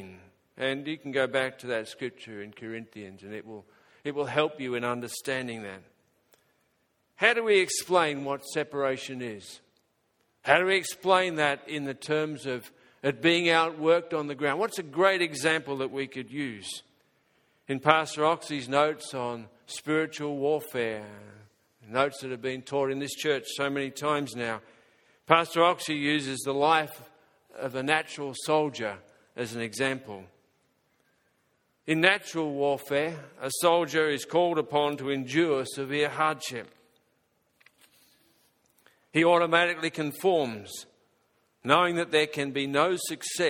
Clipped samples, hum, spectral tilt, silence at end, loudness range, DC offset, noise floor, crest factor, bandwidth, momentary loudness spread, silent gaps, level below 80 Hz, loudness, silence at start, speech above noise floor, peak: under 0.1%; none; -4 dB/octave; 0 s; 7 LU; under 0.1%; -73 dBFS; 28 dB; 17.5 kHz; 16 LU; none; -74 dBFS; -27 LUFS; 0 s; 45 dB; -2 dBFS